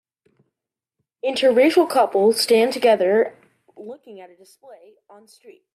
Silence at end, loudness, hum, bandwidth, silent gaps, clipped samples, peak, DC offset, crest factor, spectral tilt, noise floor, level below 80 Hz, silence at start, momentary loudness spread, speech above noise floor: 0.25 s; -18 LUFS; none; 15 kHz; none; under 0.1%; -4 dBFS; under 0.1%; 16 dB; -3.5 dB/octave; -86 dBFS; -74 dBFS; 1.25 s; 22 LU; 66 dB